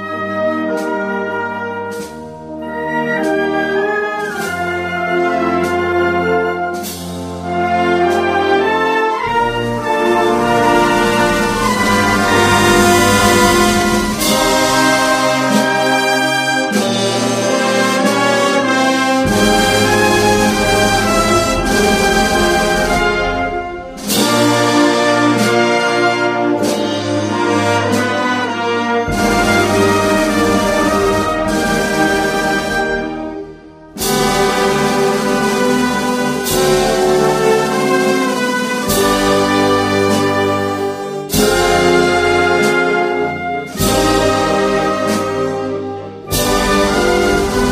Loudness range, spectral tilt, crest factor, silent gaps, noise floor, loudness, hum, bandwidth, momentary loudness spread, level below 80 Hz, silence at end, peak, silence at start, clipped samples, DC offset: 5 LU; -4 dB/octave; 14 dB; none; -35 dBFS; -14 LUFS; none; 15.5 kHz; 8 LU; -34 dBFS; 0 s; 0 dBFS; 0 s; under 0.1%; under 0.1%